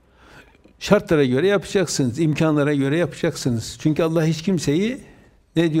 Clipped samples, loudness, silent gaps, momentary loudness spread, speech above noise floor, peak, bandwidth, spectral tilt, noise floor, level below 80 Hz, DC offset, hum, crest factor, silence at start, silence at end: under 0.1%; -20 LUFS; none; 7 LU; 29 dB; 0 dBFS; 16 kHz; -6 dB/octave; -48 dBFS; -50 dBFS; under 0.1%; none; 20 dB; 0.35 s; 0 s